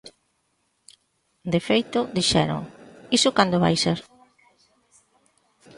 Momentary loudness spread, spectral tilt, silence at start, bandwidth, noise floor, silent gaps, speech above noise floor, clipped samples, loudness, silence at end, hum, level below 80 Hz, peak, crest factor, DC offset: 12 LU; -4.5 dB/octave; 1.45 s; 11.5 kHz; -71 dBFS; none; 49 dB; under 0.1%; -22 LUFS; 1.75 s; none; -54 dBFS; -2 dBFS; 22 dB; under 0.1%